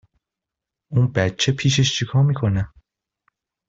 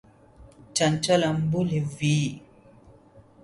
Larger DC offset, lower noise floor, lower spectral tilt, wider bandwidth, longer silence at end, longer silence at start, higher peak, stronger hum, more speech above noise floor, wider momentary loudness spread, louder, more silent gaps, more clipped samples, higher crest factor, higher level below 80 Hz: neither; first, -86 dBFS vs -53 dBFS; about the same, -5 dB/octave vs -5 dB/octave; second, 7.8 kHz vs 11.5 kHz; first, 1 s vs 0.25 s; first, 0.9 s vs 0.4 s; first, -4 dBFS vs -10 dBFS; neither; first, 67 dB vs 29 dB; about the same, 7 LU vs 8 LU; first, -20 LUFS vs -25 LUFS; neither; neither; about the same, 18 dB vs 18 dB; first, -48 dBFS vs -56 dBFS